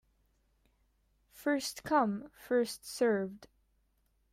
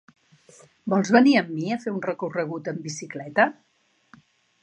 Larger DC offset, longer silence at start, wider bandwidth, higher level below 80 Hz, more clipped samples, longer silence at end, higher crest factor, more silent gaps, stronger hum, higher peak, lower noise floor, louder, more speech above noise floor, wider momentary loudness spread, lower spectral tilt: neither; first, 1.35 s vs 0.85 s; first, 16 kHz vs 9.2 kHz; about the same, -72 dBFS vs -76 dBFS; neither; second, 0.85 s vs 1.1 s; about the same, 18 dB vs 20 dB; neither; neither; second, -18 dBFS vs -4 dBFS; first, -74 dBFS vs -57 dBFS; second, -33 LUFS vs -23 LUFS; first, 42 dB vs 34 dB; second, 8 LU vs 16 LU; about the same, -4.5 dB/octave vs -5.5 dB/octave